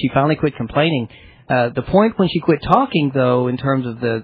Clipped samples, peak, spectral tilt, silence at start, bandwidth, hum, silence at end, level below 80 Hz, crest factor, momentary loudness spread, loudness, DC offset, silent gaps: under 0.1%; 0 dBFS; -9.5 dB/octave; 0 s; 5.4 kHz; none; 0 s; -44 dBFS; 16 dB; 5 LU; -17 LUFS; under 0.1%; none